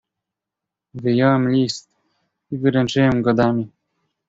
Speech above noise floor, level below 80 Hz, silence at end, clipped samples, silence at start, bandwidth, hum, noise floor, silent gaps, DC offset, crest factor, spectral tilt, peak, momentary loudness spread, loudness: 68 dB; -52 dBFS; 0.6 s; under 0.1%; 0.95 s; 7.8 kHz; none; -85 dBFS; none; under 0.1%; 18 dB; -6.5 dB/octave; -2 dBFS; 15 LU; -18 LUFS